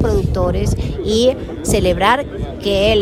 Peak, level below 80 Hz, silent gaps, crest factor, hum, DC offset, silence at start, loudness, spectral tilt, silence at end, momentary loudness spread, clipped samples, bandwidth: -2 dBFS; -26 dBFS; none; 14 dB; none; under 0.1%; 0 s; -17 LUFS; -5 dB/octave; 0 s; 8 LU; under 0.1%; 16 kHz